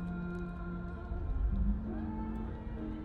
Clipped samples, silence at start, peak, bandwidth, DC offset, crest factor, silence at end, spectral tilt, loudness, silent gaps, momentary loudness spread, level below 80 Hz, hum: under 0.1%; 0 s; -22 dBFS; 4.3 kHz; under 0.1%; 14 dB; 0 s; -10.5 dB/octave; -39 LUFS; none; 7 LU; -38 dBFS; none